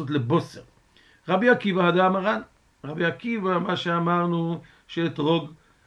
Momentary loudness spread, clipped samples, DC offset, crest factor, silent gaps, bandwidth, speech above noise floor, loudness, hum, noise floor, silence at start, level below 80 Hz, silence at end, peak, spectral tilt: 16 LU; under 0.1%; under 0.1%; 20 dB; none; 8 kHz; 34 dB; -24 LUFS; none; -58 dBFS; 0 s; -64 dBFS; 0.35 s; -6 dBFS; -7.5 dB/octave